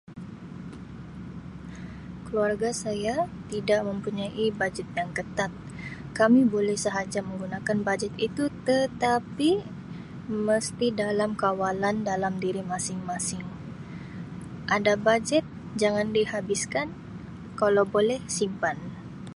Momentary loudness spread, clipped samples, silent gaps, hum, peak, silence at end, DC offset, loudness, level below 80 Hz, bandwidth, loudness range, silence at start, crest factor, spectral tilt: 17 LU; under 0.1%; none; none; -8 dBFS; 0 s; under 0.1%; -27 LUFS; -54 dBFS; 11.5 kHz; 4 LU; 0.1 s; 20 dB; -4.5 dB/octave